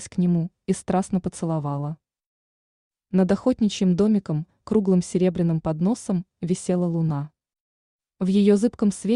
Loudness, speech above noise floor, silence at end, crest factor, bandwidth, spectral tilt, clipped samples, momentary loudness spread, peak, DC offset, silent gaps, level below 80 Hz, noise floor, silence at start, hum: -23 LUFS; over 68 dB; 0 s; 16 dB; 11 kHz; -7.5 dB/octave; under 0.1%; 9 LU; -8 dBFS; under 0.1%; 2.26-2.91 s, 7.60-7.99 s; -54 dBFS; under -90 dBFS; 0 s; none